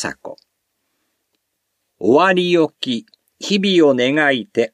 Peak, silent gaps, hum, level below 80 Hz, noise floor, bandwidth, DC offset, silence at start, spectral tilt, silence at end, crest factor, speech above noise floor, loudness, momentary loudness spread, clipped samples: -2 dBFS; none; none; -66 dBFS; -73 dBFS; 11 kHz; under 0.1%; 0 s; -5 dB/octave; 0.05 s; 16 dB; 57 dB; -16 LUFS; 14 LU; under 0.1%